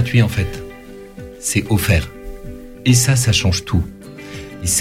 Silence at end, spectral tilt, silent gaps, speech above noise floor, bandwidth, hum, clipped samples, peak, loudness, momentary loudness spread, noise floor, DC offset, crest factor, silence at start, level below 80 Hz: 0 s; -4 dB/octave; none; 21 dB; 16 kHz; none; under 0.1%; -2 dBFS; -17 LUFS; 21 LU; -36 dBFS; under 0.1%; 16 dB; 0 s; -32 dBFS